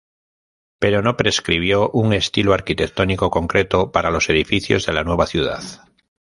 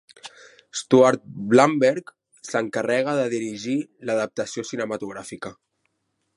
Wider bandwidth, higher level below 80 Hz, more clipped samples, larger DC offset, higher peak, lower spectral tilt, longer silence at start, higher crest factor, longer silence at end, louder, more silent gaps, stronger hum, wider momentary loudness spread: about the same, 11.5 kHz vs 11.5 kHz; first, -36 dBFS vs -70 dBFS; neither; neither; about the same, -2 dBFS vs -2 dBFS; about the same, -5 dB/octave vs -5 dB/octave; first, 0.8 s vs 0.25 s; about the same, 18 dB vs 22 dB; second, 0.45 s vs 0.85 s; first, -18 LUFS vs -22 LUFS; neither; neither; second, 5 LU vs 20 LU